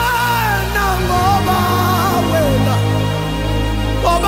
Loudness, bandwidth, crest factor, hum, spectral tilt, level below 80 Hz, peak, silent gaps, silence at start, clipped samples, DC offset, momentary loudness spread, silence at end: -15 LUFS; 16.5 kHz; 12 dB; none; -5 dB/octave; -24 dBFS; -2 dBFS; none; 0 s; under 0.1%; under 0.1%; 4 LU; 0 s